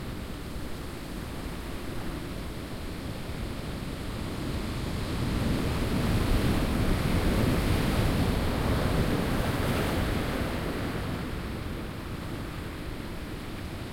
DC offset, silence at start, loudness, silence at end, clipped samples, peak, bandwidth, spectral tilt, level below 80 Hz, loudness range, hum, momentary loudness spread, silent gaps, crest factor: under 0.1%; 0 s; -31 LUFS; 0 s; under 0.1%; -12 dBFS; 16.5 kHz; -6 dB/octave; -36 dBFS; 9 LU; none; 11 LU; none; 18 dB